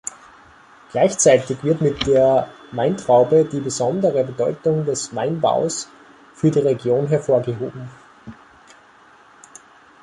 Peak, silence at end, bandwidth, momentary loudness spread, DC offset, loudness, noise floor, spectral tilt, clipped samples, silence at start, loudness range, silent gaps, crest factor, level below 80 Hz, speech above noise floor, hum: -2 dBFS; 1.7 s; 11.5 kHz; 13 LU; under 0.1%; -19 LUFS; -49 dBFS; -5 dB/octave; under 0.1%; 0.95 s; 5 LU; none; 18 dB; -52 dBFS; 31 dB; none